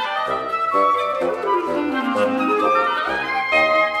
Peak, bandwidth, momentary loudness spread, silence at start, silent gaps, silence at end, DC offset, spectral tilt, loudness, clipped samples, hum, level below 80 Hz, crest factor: -4 dBFS; 15.5 kHz; 5 LU; 0 s; none; 0 s; under 0.1%; -4.5 dB/octave; -19 LUFS; under 0.1%; none; -56 dBFS; 14 dB